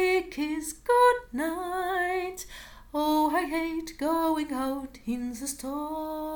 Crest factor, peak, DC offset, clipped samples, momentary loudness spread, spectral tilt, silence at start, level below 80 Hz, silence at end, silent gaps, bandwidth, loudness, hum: 16 dB; -12 dBFS; under 0.1%; under 0.1%; 12 LU; -3 dB/octave; 0 s; -54 dBFS; 0 s; none; 19 kHz; -28 LUFS; none